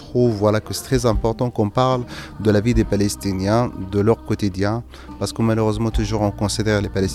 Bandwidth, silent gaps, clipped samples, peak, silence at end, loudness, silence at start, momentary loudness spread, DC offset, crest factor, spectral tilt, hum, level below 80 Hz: 14.5 kHz; none; under 0.1%; -4 dBFS; 0 s; -20 LUFS; 0 s; 5 LU; under 0.1%; 16 dB; -6 dB/octave; none; -32 dBFS